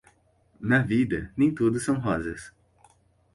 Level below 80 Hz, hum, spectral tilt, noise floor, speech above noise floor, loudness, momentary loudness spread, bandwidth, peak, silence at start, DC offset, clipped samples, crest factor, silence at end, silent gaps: -52 dBFS; none; -6.5 dB/octave; -64 dBFS; 39 dB; -25 LUFS; 13 LU; 11.5 kHz; -8 dBFS; 0.6 s; under 0.1%; under 0.1%; 18 dB; 0.85 s; none